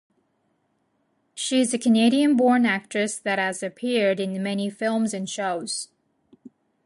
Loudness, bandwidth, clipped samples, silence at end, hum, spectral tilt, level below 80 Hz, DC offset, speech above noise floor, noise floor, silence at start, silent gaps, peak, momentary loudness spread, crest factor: -23 LUFS; 11.5 kHz; under 0.1%; 1 s; none; -4 dB/octave; -74 dBFS; under 0.1%; 48 dB; -70 dBFS; 1.35 s; none; -8 dBFS; 11 LU; 16 dB